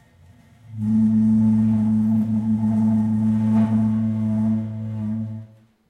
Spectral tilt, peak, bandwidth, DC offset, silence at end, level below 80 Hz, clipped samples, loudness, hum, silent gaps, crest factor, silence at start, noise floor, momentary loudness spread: -10.5 dB/octave; -10 dBFS; 3.2 kHz; under 0.1%; 0.45 s; -52 dBFS; under 0.1%; -20 LUFS; none; none; 10 dB; 0.7 s; -51 dBFS; 11 LU